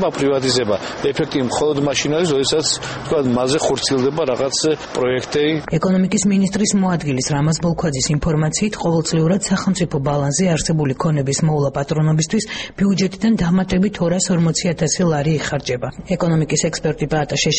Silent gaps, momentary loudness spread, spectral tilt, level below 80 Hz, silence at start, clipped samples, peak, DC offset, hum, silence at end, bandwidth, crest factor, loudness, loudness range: none; 4 LU; -5 dB/octave; -42 dBFS; 0 s; under 0.1%; -4 dBFS; under 0.1%; none; 0 s; 8.8 kHz; 14 dB; -18 LUFS; 1 LU